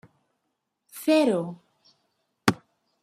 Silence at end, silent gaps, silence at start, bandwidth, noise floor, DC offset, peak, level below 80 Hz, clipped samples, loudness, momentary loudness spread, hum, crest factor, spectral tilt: 0.5 s; none; 0.95 s; 15.5 kHz; -79 dBFS; under 0.1%; -2 dBFS; -68 dBFS; under 0.1%; -25 LUFS; 19 LU; none; 26 dB; -5 dB/octave